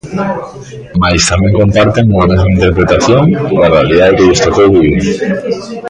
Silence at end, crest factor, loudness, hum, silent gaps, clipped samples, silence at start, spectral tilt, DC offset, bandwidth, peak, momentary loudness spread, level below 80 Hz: 0 s; 8 dB; -9 LUFS; none; none; under 0.1%; 0.05 s; -5.5 dB/octave; under 0.1%; 10.5 kHz; 0 dBFS; 10 LU; -24 dBFS